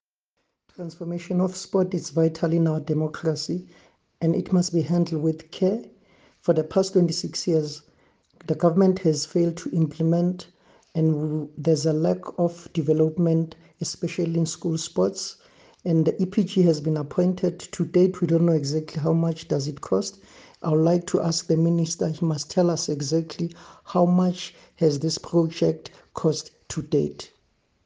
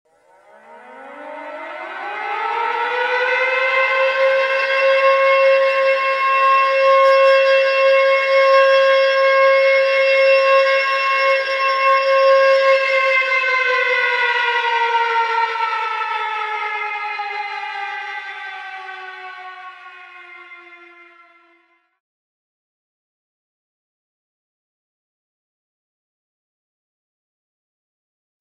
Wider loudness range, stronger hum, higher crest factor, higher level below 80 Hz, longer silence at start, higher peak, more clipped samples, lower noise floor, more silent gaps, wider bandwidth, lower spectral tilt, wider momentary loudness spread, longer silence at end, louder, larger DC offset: second, 2 LU vs 14 LU; neither; about the same, 18 dB vs 16 dB; first, -62 dBFS vs -78 dBFS; about the same, 0.8 s vs 0.7 s; second, -6 dBFS vs -2 dBFS; neither; first, -77 dBFS vs -59 dBFS; neither; first, 9.6 kHz vs 8 kHz; first, -6.5 dB/octave vs 0 dB/octave; second, 12 LU vs 17 LU; second, 0.6 s vs 7.65 s; second, -24 LUFS vs -15 LUFS; neither